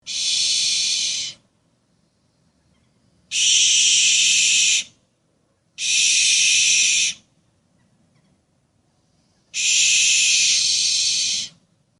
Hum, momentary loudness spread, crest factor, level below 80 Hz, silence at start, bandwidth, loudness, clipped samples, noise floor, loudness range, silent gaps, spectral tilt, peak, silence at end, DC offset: none; 12 LU; 16 dB; -68 dBFS; 0.05 s; 11.5 kHz; -15 LUFS; under 0.1%; -65 dBFS; 7 LU; none; 4.5 dB/octave; -4 dBFS; 0.5 s; under 0.1%